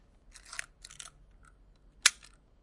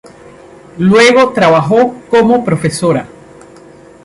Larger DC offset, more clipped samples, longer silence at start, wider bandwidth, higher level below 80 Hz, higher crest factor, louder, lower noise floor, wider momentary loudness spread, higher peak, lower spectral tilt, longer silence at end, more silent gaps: neither; neither; second, 0.55 s vs 0.75 s; about the same, 11.5 kHz vs 11.5 kHz; second, -62 dBFS vs -48 dBFS; first, 36 dB vs 12 dB; second, -30 LUFS vs -10 LUFS; first, -60 dBFS vs -37 dBFS; first, 24 LU vs 8 LU; about the same, -2 dBFS vs 0 dBFS; second, 2.5 dB/octave vs -5.5 dB/octave; second, 0.5 s vs 1 s; neither